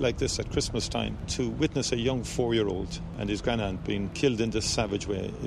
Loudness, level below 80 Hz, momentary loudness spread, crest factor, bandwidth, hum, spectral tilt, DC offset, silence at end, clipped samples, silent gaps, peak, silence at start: -29 LUFS; -42 dBFS; 5 LU; 16 dB; 13.5 kHz; none; -4.5 dB/octave; under 0.1%; 0 s; under 0.1%; none; -12 dBFS; 0 s